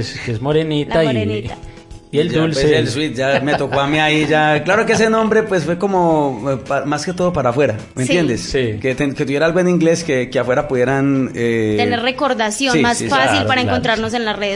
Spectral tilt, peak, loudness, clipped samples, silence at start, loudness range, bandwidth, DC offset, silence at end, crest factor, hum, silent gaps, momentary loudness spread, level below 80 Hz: -5 dB/octave; -2 dBFS; -16 LUFS; under 0.1%; 0 s; 3 LU; 11.5 kHz; under 0.1%; 0 s; 14 dB; none; none; 6 LU; -42 dBFS